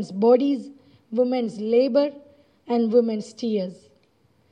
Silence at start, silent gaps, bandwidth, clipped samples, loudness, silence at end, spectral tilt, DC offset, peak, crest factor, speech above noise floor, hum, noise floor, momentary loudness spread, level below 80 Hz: 0 s; none; 9.2 kHz; under 0.1%; -22 LUFS; 0.8 s; -7 dB/octave; under 0.1%; -6 dBFS; 16 dB; 41 dB; none; -63 dBFS; 11 LU; -78 dBFS